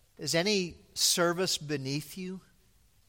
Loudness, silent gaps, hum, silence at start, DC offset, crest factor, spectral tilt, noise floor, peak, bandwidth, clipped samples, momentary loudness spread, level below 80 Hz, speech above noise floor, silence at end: -29 LUFS; none; none; 0.2 s; under 0.1%; 20 dB; -3 dB/octave; -65 dBFS; -12 dBFS; 17 kHz; under 0.1%; 16 LU; -64 dBFS; 35 dB; 0.7 s